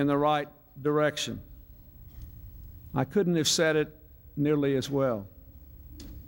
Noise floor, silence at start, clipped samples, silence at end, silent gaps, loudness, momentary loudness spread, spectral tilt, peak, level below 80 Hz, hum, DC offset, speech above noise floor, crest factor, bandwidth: -50 dBFS; 0 s; under 0.1%; 0 s; none; -28 LUFS; 23 LU; -4.5 dB/octave; -12 dBFS; -52 dBFS; none; under 0.1%; 23 dB; 18 dB; 16.5 kHz